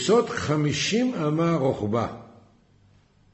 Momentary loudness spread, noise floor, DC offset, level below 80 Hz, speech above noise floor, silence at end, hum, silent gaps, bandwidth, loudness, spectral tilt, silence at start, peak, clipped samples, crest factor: 6 LU; -58 dBFS; under 0.1%; -56 dBFS; 35 dB; 1.05 s; none; none; 8.4 kHz; -24 LUFS; -5.5 dB/octave; 0 s; -8 dBFS; under 0.1%; 16 dB